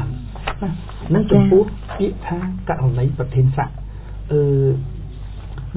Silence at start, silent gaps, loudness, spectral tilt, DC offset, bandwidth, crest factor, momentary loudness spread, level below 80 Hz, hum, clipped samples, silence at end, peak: 0 s; none; -19 LUFS; -12.5 dB/octave; under 0.1%; 4 kHz; 18 dB; 18 LU; -32 dBFS; none; under 0.1%; 0 s; 0 dBFS